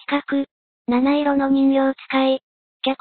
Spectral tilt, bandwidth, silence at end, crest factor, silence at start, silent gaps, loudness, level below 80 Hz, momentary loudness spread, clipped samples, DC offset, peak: -8 dB/octave; 4.5 kHz; 0.05 s; 14 dB; 0.1 s; 0.51-0.85 s, 2.43-2.80 s; -20 LUFS; -60 dBFS; 9 LU; under 0.1%; under 0.1%; -6 dBFS